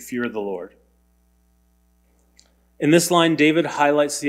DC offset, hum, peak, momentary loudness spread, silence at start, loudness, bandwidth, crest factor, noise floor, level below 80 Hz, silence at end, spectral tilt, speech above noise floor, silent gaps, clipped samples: under 0.1%; none; -2 dBFS; 14 LU; 0 s; -19 LUFS; 16 kHz; 18 dB; -61 dBFS; -62 dBFS; 0 s; -4.5 dB/octave; 42 dB; none; under 0.1%